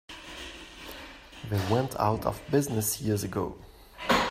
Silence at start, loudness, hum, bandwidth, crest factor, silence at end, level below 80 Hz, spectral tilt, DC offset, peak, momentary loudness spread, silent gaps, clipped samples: 0.1 s; -29 LUFS; none; 16 kHz; 20 dB; 0 s; -52 dBFS; -4.5 dB/octave; under 0.1%; -10 dBFS; 17 LU; none; under 0.1%